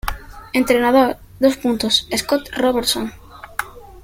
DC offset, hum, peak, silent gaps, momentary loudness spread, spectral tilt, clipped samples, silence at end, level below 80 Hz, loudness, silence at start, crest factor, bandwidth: under 0.1%; none; -2 dBFS; none; 14 LU; -3 dB/octave; under 0.1%; 0.05 s; -40 dBFS; -18 LUFS; 0.05 s; 16 dB; 16.5 kHz